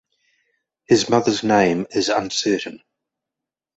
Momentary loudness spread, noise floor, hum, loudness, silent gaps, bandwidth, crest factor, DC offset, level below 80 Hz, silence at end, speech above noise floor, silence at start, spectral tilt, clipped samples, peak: 6 LU; -86 dBFS; none; -19 LUFS; none; 8.2 kHz; 20 dB; under 0.1%; -58 dBFS; 1 s; 68 dB; 0.9 s; -4 dB/octave; under 0.1%; -2 dBFS